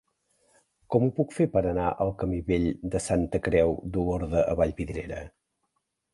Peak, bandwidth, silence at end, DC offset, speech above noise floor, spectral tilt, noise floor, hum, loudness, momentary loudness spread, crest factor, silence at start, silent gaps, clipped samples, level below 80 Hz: -8 dBFS; 11.5 kHz; 0.85 s; under 0.1%; 52 dB; -7 dB/octave; -78 dBFS; none; -27 LUFS; 10 LU; 18 dB; 0.9 s; none; under 0.1%; -42 dBFS